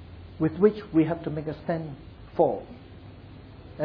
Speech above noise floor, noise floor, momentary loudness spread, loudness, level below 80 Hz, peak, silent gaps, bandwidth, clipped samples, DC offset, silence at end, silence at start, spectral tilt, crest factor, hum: 20 dB; -45 dBFS; 24 LU; -27 LUFS; -52 dBFS; -8 dBFS; none; 5.2 kHz; under 0.1%; under 0.1%; 0 s; 0 s; -11 dB/octave; 20 dB; none